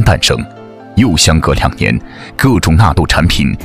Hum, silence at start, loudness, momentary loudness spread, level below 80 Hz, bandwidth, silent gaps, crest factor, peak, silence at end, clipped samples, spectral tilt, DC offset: none; 0 s; -11 LUFS; 9 LU; -20 dBFS; 16 kHz; none; 10 dB; 0 dBFS; 0 s; 0.2%; -4.5 dB/octave; under 0.1%